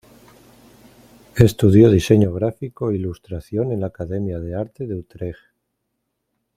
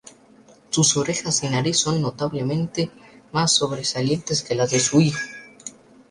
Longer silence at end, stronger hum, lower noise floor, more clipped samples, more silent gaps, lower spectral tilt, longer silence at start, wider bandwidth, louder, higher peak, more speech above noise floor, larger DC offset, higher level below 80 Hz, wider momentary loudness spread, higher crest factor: first, 1.25 s vs 0.4 s; neither; first, -75 dBFS vs -51 dBFS; neither; neither; first, -8 dB/octave vs -3.5 dB/octave; first, 1.35 s vs 0.05 s; first, 15.5 kHz vs 11.5 kHz; about the same, -19 LUFS vs -21 LUFS; first, 0 dBFS vs -4 dBFS; first, 57 dB vs 30 dB; neither; first, -44 dBFS vs -56 dBFS; first, 18 LU vs 12 LU; about the same, 20 dB vs 18 dB